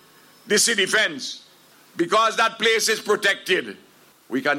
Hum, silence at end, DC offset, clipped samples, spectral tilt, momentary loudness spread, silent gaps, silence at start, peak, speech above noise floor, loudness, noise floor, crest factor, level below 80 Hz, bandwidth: none; 0 s; under 0.1%; under 0.1%; -1.5 dB/octave; 14 LU; none; 0.45 s; -6 dBFS; 31 dB; -20 LUFS; -53 dBFS; 16 dB; -72 dBFS; 17 kHz